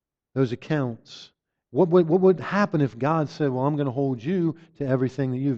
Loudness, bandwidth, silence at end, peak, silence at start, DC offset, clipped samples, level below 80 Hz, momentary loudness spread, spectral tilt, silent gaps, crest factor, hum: -24 LUFS; 7.4 kHz; 0 s; -8 dBFS; 0.35 s; under 0.1%; under 0.1%; -62 dBFS; 12 LU; -8.5 dB/octave; none; 16 dB; none